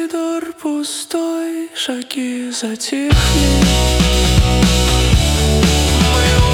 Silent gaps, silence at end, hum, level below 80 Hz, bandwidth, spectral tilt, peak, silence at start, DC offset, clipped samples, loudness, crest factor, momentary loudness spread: none; 0 s; none; -18 dBFS; 17.5 kHz; -4.5 dB/octave; -2 dBFS; 0 s; under 0.1%; under 0.1%; -15 LUFS; 12 dB; 9 LU